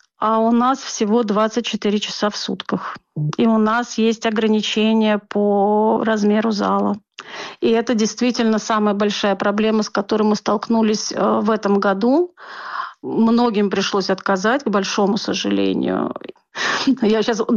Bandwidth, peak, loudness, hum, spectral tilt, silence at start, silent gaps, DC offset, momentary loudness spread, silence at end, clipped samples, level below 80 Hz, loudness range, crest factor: 7.4 kHz; -8 dBFS; -18 LUFS; none; -5 dB/octave; 0.2 s; none; under 0.1%; 9 LU; 0 s; under 0.1%; -62 dBFS; 2 LU; 10 dB